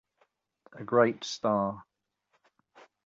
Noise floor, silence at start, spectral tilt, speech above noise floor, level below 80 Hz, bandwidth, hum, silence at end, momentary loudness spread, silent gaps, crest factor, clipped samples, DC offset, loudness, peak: -76 dBFS; 0.75 s; -5 dB/octave; 48 dB; -70 dBFS; 7.8 kHz; none; 1.25 s; 18 LU; none; 22 dB; under 0.1%; under 0.1%; -28 LUFS; -10 dBFS